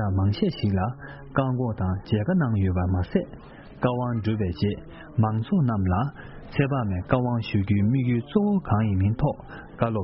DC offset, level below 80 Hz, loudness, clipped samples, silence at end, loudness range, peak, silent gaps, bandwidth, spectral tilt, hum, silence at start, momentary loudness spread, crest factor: under 0.1%; -46 dBFS; -25 LUFS; under 0.1%; 0 s; 2 LU; -6 dBFS; none; 5.8 kHz; -7.5 dB/octave; none; 0 s; 8 LU; 18 dB